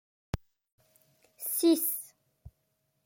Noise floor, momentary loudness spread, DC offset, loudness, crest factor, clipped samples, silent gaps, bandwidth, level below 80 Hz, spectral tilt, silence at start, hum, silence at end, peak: -77 dBFS; 16 LU; under 0.1%; -30 LUFS; 20 dB; under 0.1%; 0.72-0.78 s; 17 kHz; -54 dBFS; -4.5 dB/octave; 0.35 s; none; 0.55 s; -16 dBFS